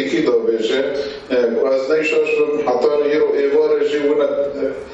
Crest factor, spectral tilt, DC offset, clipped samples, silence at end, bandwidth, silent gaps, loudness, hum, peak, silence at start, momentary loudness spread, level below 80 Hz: 14 dB; -5 dB/octave; under 0.1%; under 0.1%; 0 s; 8 kHz; none; -17 LUFS; none; -2 dBFS; 0 s; 5 LU; -54 dBFS